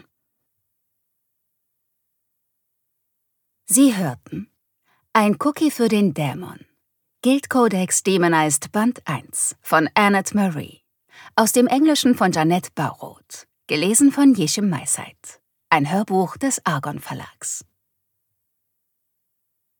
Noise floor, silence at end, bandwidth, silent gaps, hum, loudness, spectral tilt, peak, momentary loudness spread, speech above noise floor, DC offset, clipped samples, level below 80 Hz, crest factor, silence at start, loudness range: -75 dBFS; 2.2 s; 19 kHz; none; none; -19 LUFS; -4 dB/octave; -2 dBFS; 17 LU; 56 dB; under 0.1%; under 0.1%; -68 dBFS; 20 dB; 3.7 s; 5 LU